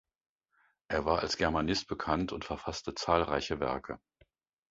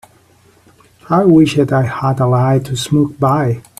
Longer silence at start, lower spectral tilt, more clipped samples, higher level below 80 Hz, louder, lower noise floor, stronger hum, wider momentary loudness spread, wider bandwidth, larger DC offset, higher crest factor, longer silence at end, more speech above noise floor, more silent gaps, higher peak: second, 0.9 s vs 1.1 s; second, -3.5 dB/octave vs -7 dB/octave; neither; about the same, -50 dBFS vs -48 dBFS; second, -33 LUFS vs -13 LUFS; first, -73 dBFS vs -49 dBFS; neither; first, 9 LU vs 6 LU; second, 7.6 kHz vs 13.5 kHz; neither; first, 24 dB vs 14 dB; first, 0.75 s vs 0.2 s; first, 41 dB vs 37 dB; neither; second, -10 dBFS vs 0 dBFS